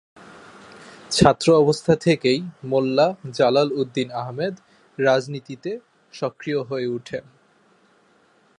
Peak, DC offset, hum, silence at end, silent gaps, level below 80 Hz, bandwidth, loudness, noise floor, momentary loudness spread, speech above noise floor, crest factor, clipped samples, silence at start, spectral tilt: 0 dBFS; under 0.1%; none; 1.4 s; none; -52 dBFS; 11.5 kHz; -21 LUFS; -59 dBFS; 15 LU; 38 dB; 22 dB; under 0.1%; 0.2 s; -5.5 dB/octave